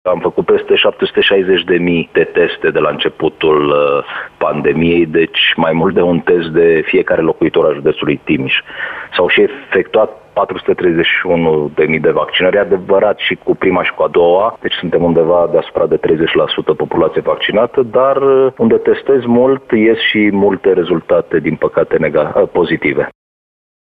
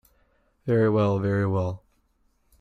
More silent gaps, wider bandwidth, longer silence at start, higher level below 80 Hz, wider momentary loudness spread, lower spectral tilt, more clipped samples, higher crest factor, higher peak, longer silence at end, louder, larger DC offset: neither; second, 4.7 kHz vs 6.4 kHz; second, 0.05 s vs 0.65 s; first, -46 dBFS vs -58 dBFS; second, 5 LU vs 14 LU; second, -8 dB/octave vs -9.5 dB/octave; neither; about the same, 12 dB vs 14 dB; first, 0 dBFS vs -12 dBFS; about the same, 0.75 s vs 0.85 s; first, -12 LUFS vs -24 LUFS; neither